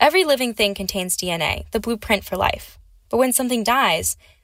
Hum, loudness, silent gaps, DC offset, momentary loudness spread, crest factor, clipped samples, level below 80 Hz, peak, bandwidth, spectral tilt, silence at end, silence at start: none; -20 LUFS; none; under 0.1%; 8 LU; 18 dB; under 0.1%; -42 dBFS; -2 dBFS; 16 kHz; -2.5 dB/octave; 0.3 s; 0 s